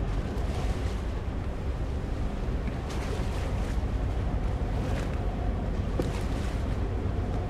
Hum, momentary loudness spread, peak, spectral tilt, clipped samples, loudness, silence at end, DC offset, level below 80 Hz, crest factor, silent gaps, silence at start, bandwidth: none; 3 LU; -14 dBFS; -7 dB/octave; under 0.1%; -32 LUFS; 0 s; under 0.1%; -32 dBFS; 16 dB; none; 0 s; 12.5 kHz